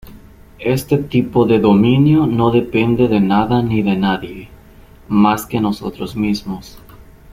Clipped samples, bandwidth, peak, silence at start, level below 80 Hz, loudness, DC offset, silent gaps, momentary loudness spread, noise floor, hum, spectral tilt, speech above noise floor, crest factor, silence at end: under 0.1%; 15.5 kHz; -2 dBFS; 0.05 s; -40 dBFS; -15 LUFS; under 0.1%; none; 12 LU; -42 dBFS; none; -7.5 dB/octave; 27 dB; 14 dB; 0.3 s